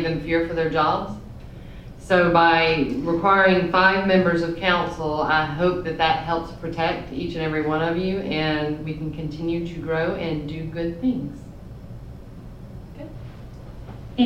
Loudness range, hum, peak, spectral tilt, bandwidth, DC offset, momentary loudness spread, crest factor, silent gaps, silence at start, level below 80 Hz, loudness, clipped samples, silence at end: 12 LU; none; -2 dBFS; -7 dB/octave; 10 kHz; under 0.1%; 24 LU; 20 dB; none; 0 s; -42 dBFS; -22 LUFS; under 0.1%; 0 s